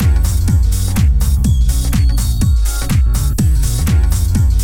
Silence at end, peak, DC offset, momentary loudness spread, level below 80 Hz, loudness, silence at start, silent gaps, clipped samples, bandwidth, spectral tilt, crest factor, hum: 0 s; -2 dBFS; under 0.1%; 1 LU; -14 dBFS; -15 LUFS; 0 s; none; under 0.1%; 18 kHz; -5.5 dB/octave; 10 dB; none